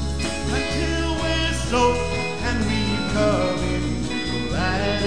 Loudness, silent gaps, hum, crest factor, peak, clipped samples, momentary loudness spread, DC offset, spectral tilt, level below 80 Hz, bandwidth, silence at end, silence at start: -23 LUFS; none; none; 16 dB; -6 dBFS; under 0.1%; 5 LU; 2%; -5 dB/octave; -30 dBFS; 10.5 kHz; 0 s; 0 s